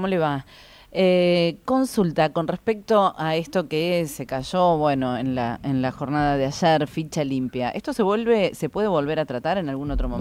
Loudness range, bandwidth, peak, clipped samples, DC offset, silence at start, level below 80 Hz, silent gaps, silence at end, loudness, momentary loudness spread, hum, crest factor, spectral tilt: 2 LU; 16 kHz; -6 dBFS; under 0.1%; under 0.1%; 0 s; -40 dBFS; none; 0 s; -23 LUFS; 7 LU; none; 16 dB; -6 dB/octave